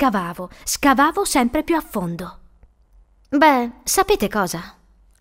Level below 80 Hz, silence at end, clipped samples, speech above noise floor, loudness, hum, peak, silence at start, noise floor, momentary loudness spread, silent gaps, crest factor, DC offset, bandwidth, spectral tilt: -44 dBFS; 0.5 s; under 0.1%; 34 dB; -19 LUFS; none; 0 dBFS; 0 s; -53 dBFS; 14 LU; none; 20 dB; under 0.1%; 16 kHz; -3.5 dB/octave